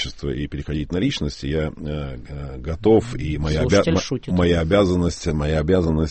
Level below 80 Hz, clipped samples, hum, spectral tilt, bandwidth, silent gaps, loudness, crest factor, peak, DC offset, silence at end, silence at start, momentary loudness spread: -32 dBFS; under 0.1%; none; -6.5 dB/octave; 8.8 kHz; none; -21 LUFS; 16 dB; -4 dBFS; under 0.1%; 0 s; 0 s; 12 LU